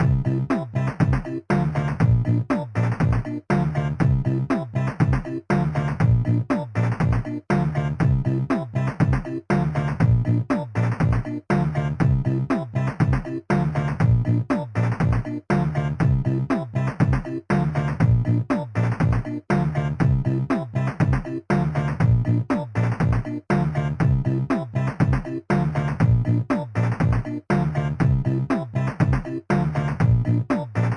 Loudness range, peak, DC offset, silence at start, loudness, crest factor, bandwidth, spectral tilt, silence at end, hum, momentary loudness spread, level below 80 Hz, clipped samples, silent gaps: 1 LU; -6 dBFS; under 0.1%; 0 s; -23 LUFS; 16 dB; 9.8 kHz; -9 dB/octave; 0 s; none; 5 LU; -36 dBFS; under 0.1%; none